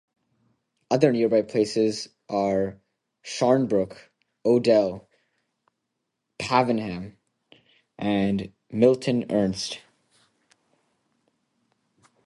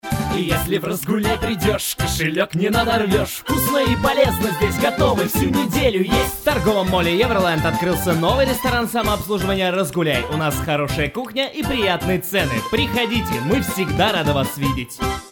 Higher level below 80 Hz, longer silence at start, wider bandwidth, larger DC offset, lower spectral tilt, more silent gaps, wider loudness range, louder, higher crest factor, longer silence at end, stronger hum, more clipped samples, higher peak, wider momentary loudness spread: second, -60 dBFS vs -34 dBFS; first, 0.9 s vs 0.05 s; second, 11.5 kHz vs over 20 kHz; neither; about the same, -6 dB/octave vs -5 dB/octave; neither; about the same, 4 LU vs 2 LU; second, -24 LUFS vs -19 LUFS; first, 22 dB vs 16 dB; first, 2.45 s vs 0 s; neither; neither; about the same, -4 dBFS vs -2 dBFS; first, 14 LU vs 4 LU